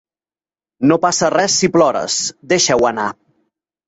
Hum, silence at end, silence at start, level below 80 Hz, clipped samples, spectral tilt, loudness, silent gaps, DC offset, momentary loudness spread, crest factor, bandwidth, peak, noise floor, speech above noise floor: none; 0.75 s; 0.8 s; -54 dBFS; under 0.1%; -3 dB/octave; -15 LUFS; none; under 0.1%; 6 LU; 16 dB; 8.2 kHz; -2 dBFS; under -90 dBFS; over 75 dB